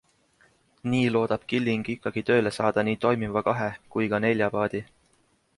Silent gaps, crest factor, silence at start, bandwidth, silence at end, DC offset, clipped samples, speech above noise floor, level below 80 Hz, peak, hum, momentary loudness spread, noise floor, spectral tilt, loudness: none; 18 dB; 0.85 s; 11.5 kHz; 0.75 s; under 0.1%; under 0.1%; 41 dB; -60 dBFS; -8 dBFS; none; 6 LU; -66 dBFS; -6.5 dB/octave; -26 LUFS